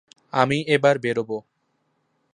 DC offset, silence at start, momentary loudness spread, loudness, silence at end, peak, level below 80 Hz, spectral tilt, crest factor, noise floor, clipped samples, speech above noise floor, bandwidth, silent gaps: under 0.1%; 0.35 s; 12 LU; -22 LUFS; 0.95 s; -2 dBFS; -64 dBFS; -5.5 dB/octave; 22 dB; -71 dBFS; under 0.1%; 50 dB; 10 kHz; none